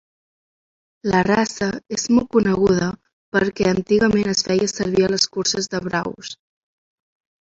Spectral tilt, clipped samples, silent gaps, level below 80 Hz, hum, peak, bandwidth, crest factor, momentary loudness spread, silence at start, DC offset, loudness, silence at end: -4.5 dB/octave; under 0.1%; 3.13-3.32 s; -50 dBFS; none; -2 dBFS; 8 kHz; 18 dB; 10 LU; 1.05 s; under 0.1%; -19 LUFS; 1.1 s